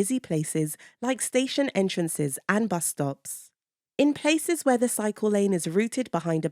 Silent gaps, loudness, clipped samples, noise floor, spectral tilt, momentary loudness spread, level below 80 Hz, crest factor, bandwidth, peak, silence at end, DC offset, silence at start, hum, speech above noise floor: none; -26 LUFS; under 0.1%; -80 dBFS; -4.5 dB/octave; 7 LU; -72 dBFS; 20 dB; 17.5 kHz; -6 dBFS; 0 s; under 0.1%; 0 s; none; 54 dB